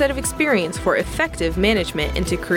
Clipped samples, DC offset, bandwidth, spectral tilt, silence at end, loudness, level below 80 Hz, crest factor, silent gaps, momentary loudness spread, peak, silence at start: under 0.1%; under 0.1%; 18 kHz; -4.5 dB/octave; 0 s; -20 LUFS; -32 dBFS; 14 dB; none; 4 LU; -6 dBFS; 0 s